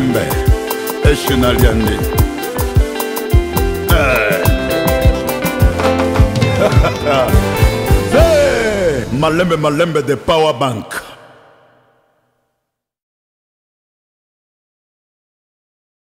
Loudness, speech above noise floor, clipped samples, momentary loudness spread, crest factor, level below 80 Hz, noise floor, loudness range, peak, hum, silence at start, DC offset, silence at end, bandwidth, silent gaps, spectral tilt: -14 LUFS; 61 dB; under 0.1%; 6 LU; 14 dB; -20 dBFS; -74 dBFS; 6 LU; 0 dBFS; none; 0 s; under 0.1%; 5.05 s; 16.5 kHz; none; -5.5 dB/octave